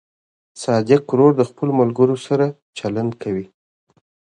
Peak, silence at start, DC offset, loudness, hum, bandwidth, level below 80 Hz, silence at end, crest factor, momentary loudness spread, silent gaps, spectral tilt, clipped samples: 0 dBFS; 0.55 s; under 0.1%; -18 LUFS; none; 10.5 kHz; -60 dBFS; 0.9 s; 18 dB; 11 LU; 2.62-2.73 s; -7.5 dB/octave; under 0.1%